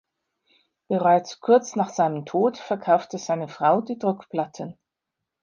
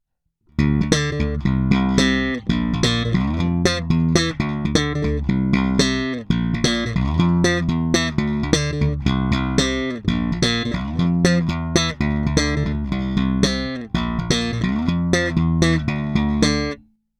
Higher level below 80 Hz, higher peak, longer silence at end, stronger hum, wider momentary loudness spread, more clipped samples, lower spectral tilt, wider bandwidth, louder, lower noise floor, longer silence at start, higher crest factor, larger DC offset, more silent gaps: second, -76 dBFS vs -32 dBFS; second, -6 dBFS vs 0 dBFS; first, 0.7 s vs 0.45 s; neither; first, 9 LU vs 5 LU; neither; about the same, -6 dB/octave vs -5 dB/octave; second, 7.4 kHz vs 13.5 kHz; second, -23 LUFS vs -20 LUFS; first, -84 dBFS vs -64 dBFS; first, 0.9 s vs 0.6 s; about the same, 18 dB vs 20 dB; neither; neither